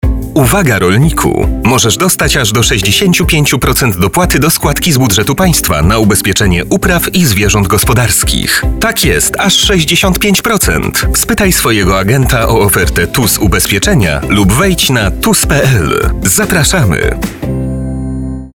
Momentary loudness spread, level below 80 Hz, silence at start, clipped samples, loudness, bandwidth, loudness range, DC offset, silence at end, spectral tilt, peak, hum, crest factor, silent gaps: 4 LU; -20 dBFS; 0.05 s; under 0.1%; -9 LUFS; over 20 kHz; 1 LU; under 0.1%; 0.05 s; -4 dB/octave; 0 dBFS; none; 10 dB; none